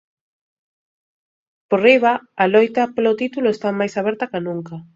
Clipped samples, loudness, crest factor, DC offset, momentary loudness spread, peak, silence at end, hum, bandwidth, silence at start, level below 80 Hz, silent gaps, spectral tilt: under 0.1%; -18 LUFS; 20 dB; under 0.1%; 11 LU; 0 dBFS; 0.15 s; none; 7.8 kHz; 1.7 s; -66 dBFS; none; -6 dB/octave